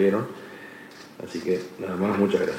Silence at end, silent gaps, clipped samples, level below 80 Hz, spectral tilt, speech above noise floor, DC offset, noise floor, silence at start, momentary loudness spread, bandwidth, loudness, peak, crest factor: 0 s; none; under 0.1%; -68 dBFS; -7 dB/octave; 20 dB; under 0.1%; -44 dBFS; 0 s; 19 LU; 16 kHz; -27 LUFS; -8 dBFS; 18 dB